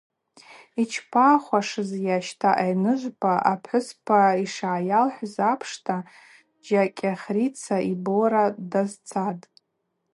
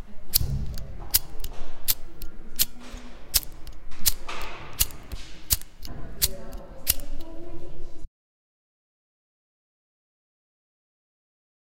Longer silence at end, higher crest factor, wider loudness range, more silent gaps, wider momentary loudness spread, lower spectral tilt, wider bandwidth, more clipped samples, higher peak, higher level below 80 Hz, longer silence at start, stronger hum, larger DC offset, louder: second, 0.75 s vs 3.75 s; second, 20 dB vs 26 dB; second, 3 LU vs 7 LU; neither; second, 9 LU vs 19 LU; first, -6 dB/octave vs -1.5 dB/octave; second, 11.5 kHz vs 17 kHz; neither; second, -4 dBFS vs 0 dBFS; second, -76 dBFS vs -36 dBFS; first, 0.5 s vs 0 s; neither; neither; first, -24 LUFS vs -27 LUFS